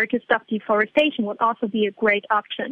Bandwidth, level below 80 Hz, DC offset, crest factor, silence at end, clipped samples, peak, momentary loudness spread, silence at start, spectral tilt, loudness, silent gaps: 7.2 kHz; -66 dBFS; under 0.1%; 16 dB; 0 s; under 0.1%; -4 dBFS; 4 LU; 0 s; -6.5 dB/octave; -21 LUFS; none